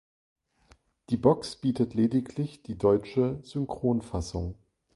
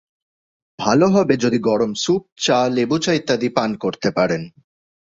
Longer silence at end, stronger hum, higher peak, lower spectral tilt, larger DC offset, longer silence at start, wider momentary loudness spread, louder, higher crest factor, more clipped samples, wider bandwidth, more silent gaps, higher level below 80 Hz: second, 0.4 s vs 0.55 s; neither; second, -6 dBFS vs 0 dBFS; first, -7.5 dB/octave vs -5 dB/octave; neither; first, 1.1 s vs 0.8 s; first, 10 LU vs 7 LU; second, -28 LUFS vs -18 LUFS; about the same, 22 dB vs 18 dB; neither; first, 11.5 kHz vs 7.8 kHz; second, none vs 2.32-2.36 s; first, -48 dBFS vs -56 dBFS